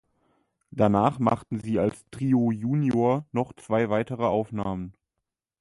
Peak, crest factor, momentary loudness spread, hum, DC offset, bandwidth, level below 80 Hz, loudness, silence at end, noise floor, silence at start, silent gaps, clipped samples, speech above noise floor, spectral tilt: -8 dBFS; 18 dB; 9 LU; none; under 0.1%; 11.5 kHz; -56 dBFS; -26 LUFS; 0.7 s; -85 dBFS; 0.75 s; none; under 0.1%; 60 dB; -8.5 dB/octave